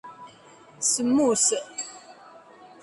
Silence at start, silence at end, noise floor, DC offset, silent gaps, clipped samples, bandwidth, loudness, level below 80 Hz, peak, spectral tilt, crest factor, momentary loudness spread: 0.05 s; 0.55 s; -51 dBFS; under 0.1%; none; under 0.1%; 11.5 kHz; -23 LUFS; -70 dBFS; -10 dBFS; -2 dB/octave; 18 dB; 21 LU